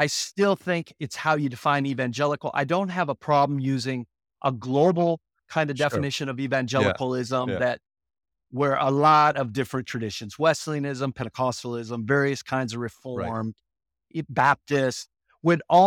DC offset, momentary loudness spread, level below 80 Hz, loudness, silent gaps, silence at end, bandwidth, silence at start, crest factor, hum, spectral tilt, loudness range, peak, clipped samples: under 0.1%; 11 LU; -62 dBFS; -25 LUFS; none; 0 s; 16.5 kHz; 0 s; 18 dB; none; -5.5 dB/octave; 4 LU; -6 dBFS; under 0.1%